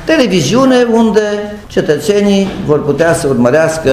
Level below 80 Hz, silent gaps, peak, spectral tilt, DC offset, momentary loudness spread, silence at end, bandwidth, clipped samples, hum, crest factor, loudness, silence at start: -38 dBFS; none; 0 dBFS; -5.5 dB/octave; under 0.1%; 6 LU; 0 s; 15.5 kHz; 0.2%; none; 10 dB; -11 LUFS; 0 s